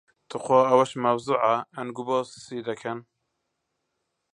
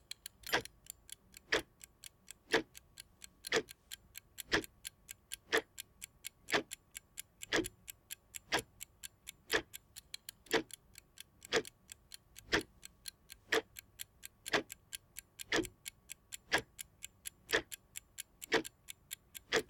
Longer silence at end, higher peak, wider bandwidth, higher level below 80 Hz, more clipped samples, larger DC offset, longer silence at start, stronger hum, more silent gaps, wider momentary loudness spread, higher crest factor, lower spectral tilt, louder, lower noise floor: first, 1.35 s vs 0.05 s; first, -6 dBFS vs -14 dBFS; second, 10.5 kHz vs 18 kHz; second, -74 dBFS vs -66 dBFS; neither; neither; about the same, 0.3 s vs 0.4 s; neither; neither; about the same, 16 LU vs 18 LU; second, 20 dB vs 28 dB; first, -5.5 dB/octave vs -2 dB/octave; first, -25 LUFS vs -39 LUFS; first, -79 dBFS vs -59 dBFS